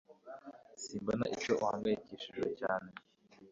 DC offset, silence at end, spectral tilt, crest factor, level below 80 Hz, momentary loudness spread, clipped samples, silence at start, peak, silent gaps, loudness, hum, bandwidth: under 0.1%; 0 s; -4 dB/octave; 20 dB; -70 dBFS; 19 LU; under 0.1%; 0.1 s; -18 dBFS; none; -37 LUFS; none; 7.6 kHz